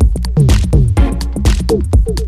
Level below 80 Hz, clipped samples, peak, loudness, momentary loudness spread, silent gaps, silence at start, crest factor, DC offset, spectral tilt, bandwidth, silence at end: -14 dBFS; under 0.1%; 0 dBFS; -13 LUFS; 4 LU; none; 0 s; 10 dB; under 0.1%; -7 dB/octave; 13.5 kHz; 0 s